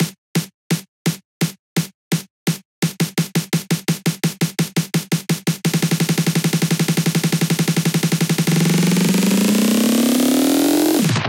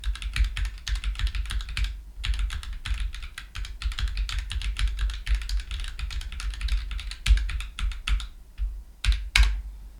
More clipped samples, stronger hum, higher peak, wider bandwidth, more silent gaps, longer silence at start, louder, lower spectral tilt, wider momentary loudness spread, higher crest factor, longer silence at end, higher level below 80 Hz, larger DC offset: neither; neither; second, -6 dBFS vs 0 dBFS; first, 17 kHz vs 13 kHz; first, 0.18-0.35 s, 0.54-0.70 s, 0.88-1.05 s, 1.25-1.40 s, 1.59-1.76 s, 1.94-2.11 s, 2.30-2.46 s, 2.65-2.82 s vs none; about the same, 0 s vs 0 s; first, -18 LUFS vs -31 LUFS; first, -5 dB/octave vs -2.5 dB/octave; about the same, 9 LU vs 11 LU; second, 12 dB vs 26 dB; about the same, 0 s vs 0 s; second, -62 dBFS vs -28 dBFS; neither